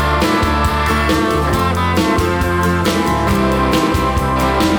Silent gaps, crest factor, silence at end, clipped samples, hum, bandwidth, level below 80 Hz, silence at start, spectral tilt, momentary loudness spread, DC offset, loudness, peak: none; 12 dB; 0 s; under 0.1%; none; over 20 kHz; -24 dBFS; 0 s; -5.5 dB/octave; 1 LU; 0.2%; -15 LUFS; -4 dBFS